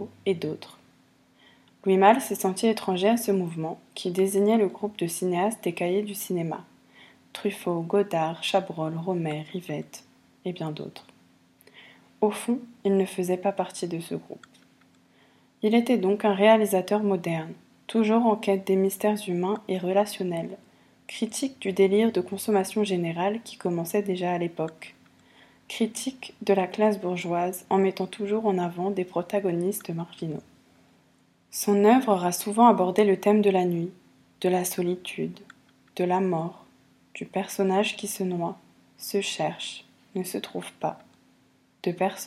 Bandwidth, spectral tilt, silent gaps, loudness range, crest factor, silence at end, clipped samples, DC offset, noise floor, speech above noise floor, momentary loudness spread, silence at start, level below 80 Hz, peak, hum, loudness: 15.5 kHz; -5.5 dB/octave; none; 7 LU; 22 dB; 0 s; under 0.1%; under 0.1%; -63 dBFS; 38 dB; 14 LU; 0 s; -74 dBFS; -4 dBFS; none; -26 LUFS